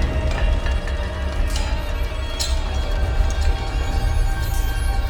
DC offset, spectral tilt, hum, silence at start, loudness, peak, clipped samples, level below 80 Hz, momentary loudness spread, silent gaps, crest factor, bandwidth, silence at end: under 0.1%; -5 dB/octave; none; 0 s; -24 LUFS; -6 dBFS; under 0.1%; -20 dBFS; 4 LU; none; 14 dB; 18 kHz; 0 s